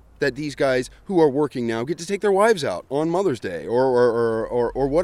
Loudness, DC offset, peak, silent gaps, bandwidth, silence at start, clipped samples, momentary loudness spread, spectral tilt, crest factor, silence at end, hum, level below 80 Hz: -21 LUFS; under 0.1%; -4 dBFS; none; 13 kHz; 0.2 s; under 0.1%; 7 LU; -6 dB/octave; 16 dB; 0 s; none; -48 dBFS